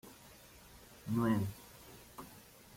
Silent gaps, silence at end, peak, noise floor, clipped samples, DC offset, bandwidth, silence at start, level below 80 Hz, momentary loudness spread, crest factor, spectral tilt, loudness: none; 0 s; -22 dBFS; -58 dBFS; under 0.1%; under 0.1%; 16.5 kHz; 0.05 s; -64 dBFS; 23 LU; 18 dB; -6.5 dB/octave; -36 LUFS